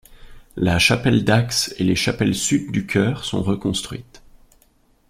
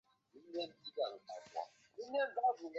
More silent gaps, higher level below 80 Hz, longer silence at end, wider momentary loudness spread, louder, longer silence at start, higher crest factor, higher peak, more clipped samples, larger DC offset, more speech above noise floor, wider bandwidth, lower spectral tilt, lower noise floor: neither; first, -44 dBFS vs under -90 dBFS; first, 1.1 s vs 0 s; second, 9 LU vs 15 LU; first, -19 LUFS vs -42 LUFS; second, 0.1 s vs 0.35 s; about the same, 18 dB vs 18 dB; first, -2 dBFS vs -24 dBFS; neither; neither; first, 39 dB vs 23 dB; first, 16 kHz vs 7.8 kHz; first, -4.5 dB/octave vs 0 dB/octave; second, -58 dBFS vs -63 dBFS